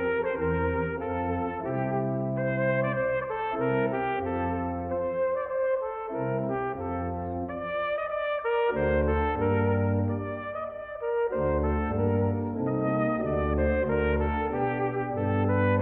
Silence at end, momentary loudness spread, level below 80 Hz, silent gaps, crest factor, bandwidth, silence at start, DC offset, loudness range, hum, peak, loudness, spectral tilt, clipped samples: 0 s; 6 LU; -40 dBFS; none; 14 dB; 4 kHz; 0 s; under 0.1%; 3 LU; none; -14 dBFS; -28 LUFS; -11.5 dB/octave; under 0.1%